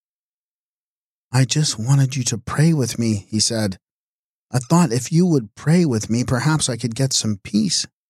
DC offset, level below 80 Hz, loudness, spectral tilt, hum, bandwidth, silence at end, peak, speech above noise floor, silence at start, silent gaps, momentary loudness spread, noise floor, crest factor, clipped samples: under 0.1%; -52 dBFS; -19 LUFS; -5 dB/octave; none; 14 kHz; 0.25 s; -4 dBFS; over 72 dB; 1.3 s; 3.92-4.47 s; 5 LU; under -90 dBFS; 16 dB; under 0.1%